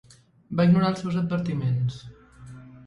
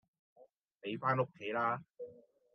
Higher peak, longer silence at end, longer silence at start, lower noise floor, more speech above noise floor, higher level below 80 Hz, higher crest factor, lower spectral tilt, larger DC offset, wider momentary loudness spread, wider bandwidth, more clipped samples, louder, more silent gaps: first, -8 dBFS vs -18 dBFS; second, 0 s vs 0.35 s; about the same, 0.5 s vs 0.4 s; second, -45 dBFS vs -58 dBFS; about the same, 22 dB vs 22 dB; first, -56 dBFS vs -88 dBFS; about the same, 18 dB vs 22 dB; about the same, -8 dB/octave vs -8 dB/octave; neither; first, 23 LU vs 17 LU; first, 8.4 kHz vs 6.4 kHz; neither; first, -24 LUFS vs -37 LUFS; second, none vs 0.60-0.64 s